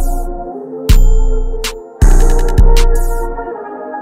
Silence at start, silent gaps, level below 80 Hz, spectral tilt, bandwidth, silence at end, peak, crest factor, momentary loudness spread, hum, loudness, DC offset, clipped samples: 0 s; none; -10 dBFS; -5.5 dB/octave; 15.5 kHz; 0 s; 0 dBFS; 10 dB; 12 LU; none; -16 LUFS; under 0.1%; under 0.1%